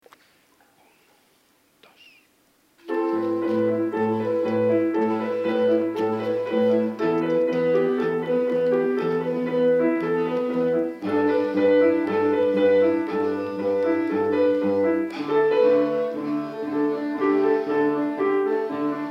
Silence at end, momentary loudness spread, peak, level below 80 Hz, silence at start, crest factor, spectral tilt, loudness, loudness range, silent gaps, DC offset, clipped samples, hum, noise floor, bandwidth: 0 s; 6 LU; -8 dBFS; -72 dBFS; 2.85 s; 14 dB; -8 dB/octave; -22 LUFS; 5 LU; none; under 0.1%; under 0.1%; none; -62 dBFS; 6.2 kHz